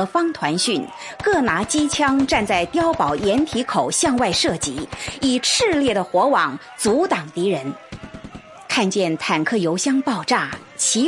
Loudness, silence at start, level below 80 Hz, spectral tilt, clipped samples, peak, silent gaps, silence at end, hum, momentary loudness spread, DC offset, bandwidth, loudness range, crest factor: -19 LUFS; 0 s; -48 dBFS; -3 dB/octave; under 0.1%; -2 dBFS; none; 0 s; none; 11 LU; under 0.1%; 11.5 kHz; 3 LU; 16 dB